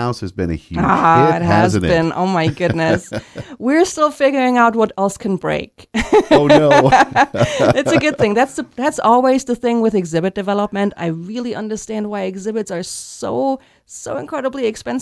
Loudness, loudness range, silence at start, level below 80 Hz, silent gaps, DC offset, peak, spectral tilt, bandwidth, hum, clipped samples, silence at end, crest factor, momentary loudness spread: -16 LUFS; 9 LU; 0 s; -42 dBFS; none; under 0.1%; 0 dBFS; -5.5 dB/octave; 11 kHz; none; under 0.1%; 0 s; 16 dB; 12 LU